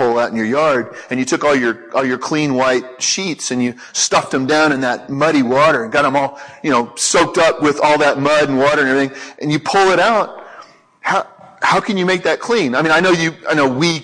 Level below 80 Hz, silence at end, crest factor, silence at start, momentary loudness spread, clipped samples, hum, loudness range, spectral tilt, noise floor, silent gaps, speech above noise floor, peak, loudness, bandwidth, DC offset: -54 dBFS; 0 s; 14 dB; 0 s; 7 LU; under 0.1%; none; 3 LU; -3.5 dB/octave; -41 dBFS; none; 26 dB; -2 dBFS; -15 LUFS; 10.5 kHz; under 0.1%